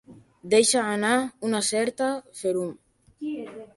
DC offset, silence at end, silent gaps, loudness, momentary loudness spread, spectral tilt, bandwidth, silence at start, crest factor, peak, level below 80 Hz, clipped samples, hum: under 0.1%; 0.1 s; none; -25 LUFS; 15 LU; -2.5 dB/octave; 11.5 kHz; 0.1 s; 18 dB; -8 dBFS; -68 dBFS; under 0.1%; none